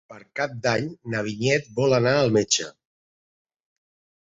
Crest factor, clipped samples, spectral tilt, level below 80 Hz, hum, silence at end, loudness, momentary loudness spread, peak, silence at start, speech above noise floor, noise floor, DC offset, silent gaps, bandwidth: 18 dB; under 0.1%; -4 dB/octave; -60 dBFS; none; 1.6 s; -23 LUFS; 10 LU; -8 dBFS; 0.1 s; over 67 dB; under -90 dBFS; under 0.1%; none; 8 kHz